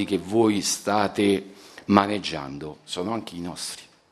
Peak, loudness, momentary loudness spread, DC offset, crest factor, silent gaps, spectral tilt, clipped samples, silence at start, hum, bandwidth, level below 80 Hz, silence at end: 0 dBFS; -24 LUFS; 15 LU; under 0.1%; 24 dB; none; -4.5 dB/octave; under 0.1%; 0 s; none; 13 kHz; -60 dBFS; 0.25 s